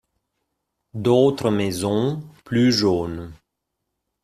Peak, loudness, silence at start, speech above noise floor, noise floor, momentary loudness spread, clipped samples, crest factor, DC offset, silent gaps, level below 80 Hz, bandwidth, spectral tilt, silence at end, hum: -4 dBFS; -20 LUFS; 0.95 s; 59 dB; -79 dBFS; 17 LU; under 0.1%; 18 dB; under 0.1%; none; -54 dBFS; 14.5 kHz; -6 dB/octave; 0.9 s; none